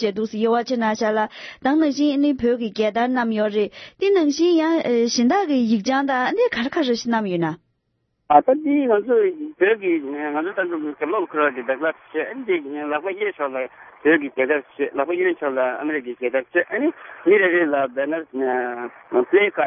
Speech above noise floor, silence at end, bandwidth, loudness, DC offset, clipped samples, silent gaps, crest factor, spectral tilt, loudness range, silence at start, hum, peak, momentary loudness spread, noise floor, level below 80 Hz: 51 dB; 0 s; 6.4 kHz; -21 LUFS; under 0.1%; under 0.1%; none; 20 dB; -5 dB/octave; 4 LU; 0 s; none; -2 dBFS; 8 LU; -71 dBFS; -64 dBFS